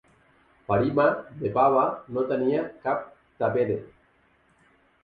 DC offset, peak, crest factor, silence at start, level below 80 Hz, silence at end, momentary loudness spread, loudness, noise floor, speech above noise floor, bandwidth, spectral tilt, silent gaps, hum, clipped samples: under 0.1%; -8 dBFS; 20 dB; 0.7 s; -60 dBFS; 1.15 s; 10 LU; -25 LUFS; -63 dBFS; 39 dB; 4.9 kHz; -10 dB/octave; none; none; under 0.1%